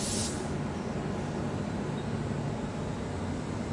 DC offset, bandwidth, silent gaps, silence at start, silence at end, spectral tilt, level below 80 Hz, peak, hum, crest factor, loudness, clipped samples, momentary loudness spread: under 0.1%; 11.5 kHz; none; 0 s; 0 s; -5 dB/octave; -48 dBFS; -18 dBFS; none; 14 dB; -34 LUFS; under 0.1%; 3 LU